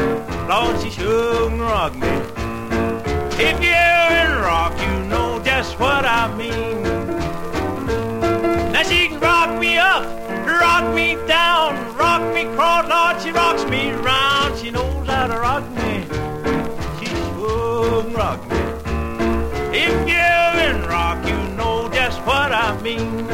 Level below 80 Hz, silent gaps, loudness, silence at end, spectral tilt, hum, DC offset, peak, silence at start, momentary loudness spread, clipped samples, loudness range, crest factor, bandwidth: -32 dBFS; none; -18 LUFS; 0 s; -4.5 dB/octave; none; 1%; -2 dBFS; 0 s; 9 LU; under 0.1%; 6 LU; 16 dB; 16.5 kHz